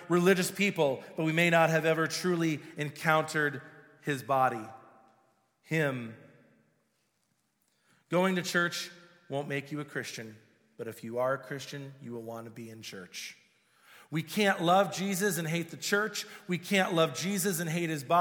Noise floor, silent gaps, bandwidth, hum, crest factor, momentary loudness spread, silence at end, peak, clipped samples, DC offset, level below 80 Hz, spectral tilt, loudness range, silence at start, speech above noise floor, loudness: -76 dBFS; none; 19.5 kHz; none; 22 dB; 17 LU; 0 s; -10 dBFS; under 0.1%; under 0.1%; -80 dBFS; -4.5 dB/octave; 10 LU; 0 s; 46 dB; -30 LUFS